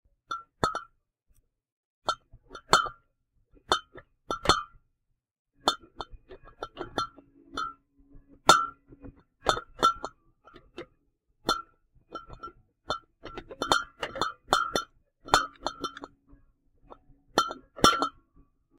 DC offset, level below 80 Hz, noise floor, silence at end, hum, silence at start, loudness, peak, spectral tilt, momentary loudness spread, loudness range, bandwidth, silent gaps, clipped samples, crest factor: under 0.1%; -52 dBFS; -78 dBFS; 0.7 s; none; 0.3 s; -29 LUFS; -2 dBFS; -2.5 dB/octave; 22 LU; 8 LU; 16 kHz; 1.72-2.02 s, 5.31-5.45 s; under 0.1%; 30 dB